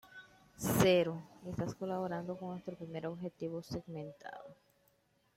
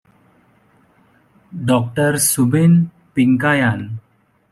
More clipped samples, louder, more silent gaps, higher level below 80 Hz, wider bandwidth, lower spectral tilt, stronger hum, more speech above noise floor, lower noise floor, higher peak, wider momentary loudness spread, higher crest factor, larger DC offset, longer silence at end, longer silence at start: neither; second, -37 LUFS vs -16 LUFS; neither; second, -64 dBFS vs -54 dBFS; about the same, 16 kHz vs 15 kHz; about the same, -5.5 dB/octave vs -5.5 dB/octave; neither; about the same, 37 dB vs 40 dB; first, -74 dBFS vs -55 dBFS; second, -14 dBFS vs -4 dBFS; first, 21 LU vs 14 LU; first, 24 dB vs 14 dB; neither; first, 0.85 s vs 0.5 s; second, 0.05 s vs 1.55 s